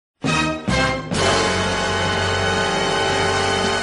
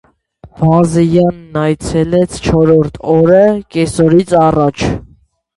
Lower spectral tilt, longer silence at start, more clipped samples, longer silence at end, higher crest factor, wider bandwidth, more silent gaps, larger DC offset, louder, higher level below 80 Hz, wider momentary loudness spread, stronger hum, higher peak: second, -3.5 dB/octave vs -7 dB/octave; second, 0.2 s vs 0.45 s; neither; second, 0 s vs 0.55 s; about the same, 16 dB vs 12 dB; about the same, 11 kHz vs 11.5 kHz; neither; neither; second, -19 LUFS vs -11 LUFS; about the same, -38 dBFS vs -34 dBFS; second, 2 LU vs 7 LU; neither; about the same, -2 dBFS vs 0 dBFS